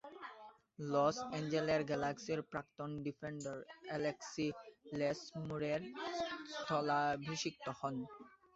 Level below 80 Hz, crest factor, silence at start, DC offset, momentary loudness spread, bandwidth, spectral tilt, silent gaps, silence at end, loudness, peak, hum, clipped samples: -74 dBFS; 20 dB; 0.05 s; under 0.1%; 14 LU; 8 kHz; -4.5 dB/octave; none; 0.2 s; -40 LUFS; -22 dBFS; none; under 0.1%